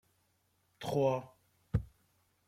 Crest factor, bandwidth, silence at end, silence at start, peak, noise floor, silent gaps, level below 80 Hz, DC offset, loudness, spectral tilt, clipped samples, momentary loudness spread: 20 dB; 15.5 kHz; 0.6 s; 0.8 s; -18 dBFS; -76 dBFS; none; -54 dBFS; under 0.1%; -36 LUFS; -7 dB/octave; under 0.1%; 13 LU